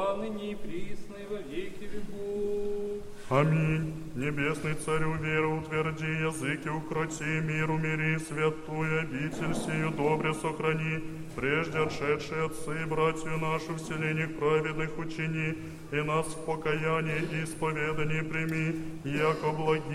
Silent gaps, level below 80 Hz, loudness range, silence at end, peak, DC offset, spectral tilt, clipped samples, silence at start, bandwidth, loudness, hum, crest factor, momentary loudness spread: none; -50 dBFS; 2 LU; 0 s; -10 dBFS; under 0.1%; -6 dB/octave; under 0.1%; 0 s; 13.5 kHz; -31 LUFS; none; 20 dB; 9 LU